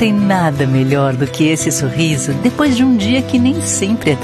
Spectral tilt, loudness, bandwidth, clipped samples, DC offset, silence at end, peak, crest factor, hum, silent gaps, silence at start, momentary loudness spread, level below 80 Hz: -5 dB/octave; -14 LUFS; 13.5 kHz; under 0.1%; under 0.1%; 0 s; 0 dBFS; 12 dB; none; none; 0 s; 3 LU; -44 dBFS